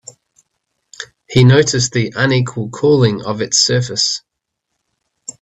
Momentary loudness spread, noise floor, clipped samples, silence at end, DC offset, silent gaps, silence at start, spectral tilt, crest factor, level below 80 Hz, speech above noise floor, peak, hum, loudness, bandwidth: 22 LU; -75 dBFS; under 0.1%; 1.25 s; under 0.1%; none; 1 s; -4.5 dB/octave; 16 dB; -50 dBFS; 62 dB; 0 dBFS; none; -14 LUFS; 8.4 kHz